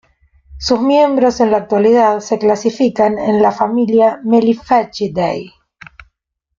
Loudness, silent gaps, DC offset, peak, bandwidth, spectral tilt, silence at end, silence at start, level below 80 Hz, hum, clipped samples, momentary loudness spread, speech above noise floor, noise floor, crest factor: -13 LUFS; none; under 0.1%; 0 dBFS; 7.4 kHz; -5.5 dB/octave; 1.1 s; 0.5 s; -46 dBFS; none; under 0.1%; 7 LU; 54 dB; -67 dBFS; 14 dB